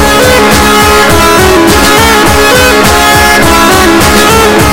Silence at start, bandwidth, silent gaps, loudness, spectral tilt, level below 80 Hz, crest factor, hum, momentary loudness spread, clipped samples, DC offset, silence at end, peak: 0 s; over 20 kHz; none; -3 LUFS; -3.5 dB/octave; -18 dBFS; 4 dB; none; 1 LU; 10%; 3%; 0 s; 0 dBFS